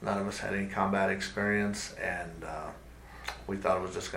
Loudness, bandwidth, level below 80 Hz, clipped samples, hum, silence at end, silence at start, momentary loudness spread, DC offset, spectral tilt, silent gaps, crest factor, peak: -33 LUFS; 16 kHz; -52 dBFS; under 0.1%; none; 0 s; 0 s; 13 LU; under 0.1%; -5 dB/octave; none; 20 dB; -12 dBFS